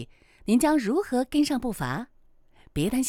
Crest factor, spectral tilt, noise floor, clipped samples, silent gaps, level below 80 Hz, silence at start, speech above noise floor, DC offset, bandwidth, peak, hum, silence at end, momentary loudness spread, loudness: 16 dB; -5 dB/octave; -56 dBFS; under 0.1%; none; -48 dBFS; 0 s; 31 dB; under 0.1%; 17.5 kHz; -10 dBFS; none; 0 s; 16 LU; -26 LUFS